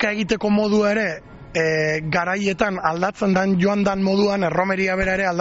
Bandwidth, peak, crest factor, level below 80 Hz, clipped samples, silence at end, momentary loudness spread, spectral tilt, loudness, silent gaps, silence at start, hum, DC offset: 8 kHz; -4 dBFS; 16 dB; -46 dBFS; under 0.1%; 0 s; 4 LU; -4.5 dB/octave; -20 LUFS; none; 0 s; none; under 0.1%